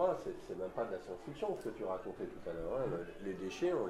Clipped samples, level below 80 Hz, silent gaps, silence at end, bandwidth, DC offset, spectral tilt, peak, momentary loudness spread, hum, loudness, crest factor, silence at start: under 0.1%; -60 dBFS; none; 0 s; 13.5 kHz; under 0.1%; -6.5 dB/octave; -22 dBFS; 7 LU; none; -41 LUFS; 18 dB; 0 s